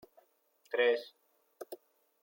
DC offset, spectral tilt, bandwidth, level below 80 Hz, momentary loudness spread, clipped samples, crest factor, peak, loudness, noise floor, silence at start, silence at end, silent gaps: under 0.1%; -2 dB/octave; 16.5 kHz; under -90 dBFS; 23 LU; under 0.1%; 20 dB; -18 dBFS; -32 LUFS; -72 dBFS; 0.7 s; 0.5 s; none